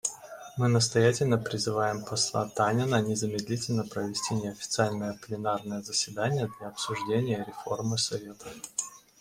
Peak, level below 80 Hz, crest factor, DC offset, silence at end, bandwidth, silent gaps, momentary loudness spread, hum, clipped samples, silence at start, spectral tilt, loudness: -10 dBFS; -64 dBFS; 20 dB; under 0.1%; 0.2 s; 16 kHz; none; 11 LU; none; under 0.1%; 0.05 s; -4.5 dB/octave; -29 LUFS